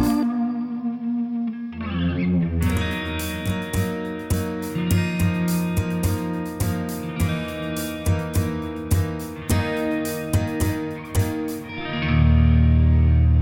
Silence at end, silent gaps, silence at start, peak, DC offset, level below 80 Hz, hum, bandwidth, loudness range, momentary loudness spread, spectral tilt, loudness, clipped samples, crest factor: 0 s; none; 0 s; -8 dBFS; under 0.1%; -28 dBFS; none; 17 kHz; 4 LU; 10 LU; -6.5 dB/octave; -23 LUFS; under 0.1%; 14 dB